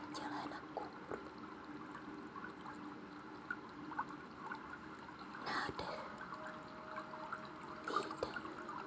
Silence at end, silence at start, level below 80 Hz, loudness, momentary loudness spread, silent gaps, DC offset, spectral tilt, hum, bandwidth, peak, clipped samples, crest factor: 0 s; 0 s; -72 dBFS; -47 LUFS; 10 LU; none; under 0.1%; -4.5 dB/octave; none; 8 kHz; -24 dBFS; under 0.1%; 22 dB